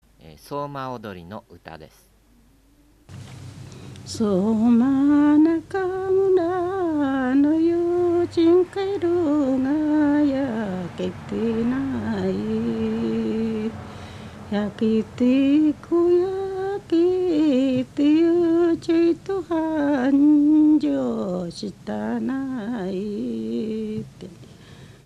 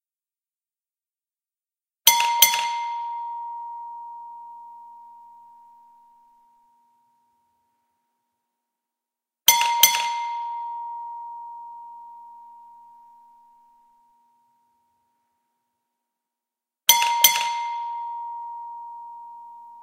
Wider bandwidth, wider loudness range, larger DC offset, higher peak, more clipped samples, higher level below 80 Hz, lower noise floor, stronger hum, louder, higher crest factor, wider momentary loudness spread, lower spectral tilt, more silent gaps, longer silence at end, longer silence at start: second, 10 kHz vs 16 kHz; second, 9 LU vs 18 LU; neither; second, -8 dBFS vs 0 dBFS; neither; first, -54 dBFS vs -82 dBFS; second, -56 dBFS vs under -90 dBFS; neither; about the same, -21 LUFS vs -20 LUFS; second, 12 dB vs 28 dB; second, 17 LU vs 25 LU; first, -7.5 dB/octave vs 3.5 dB/octave; neither; first, 0.2 s vs 0 s; second, 0.25 s vs 2.05 s